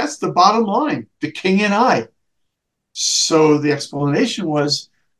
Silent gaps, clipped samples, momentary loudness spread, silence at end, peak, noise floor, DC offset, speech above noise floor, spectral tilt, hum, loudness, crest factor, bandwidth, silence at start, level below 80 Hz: none; under 0.1%; 9 LU; 0.35 s; 0 dBFS; -75 dBFS; under 0.1%; 59 dB; -4 dB/octave; none; -16 LUFS; 18 dB; 12.5 kHz; 0 s; -66 dBFS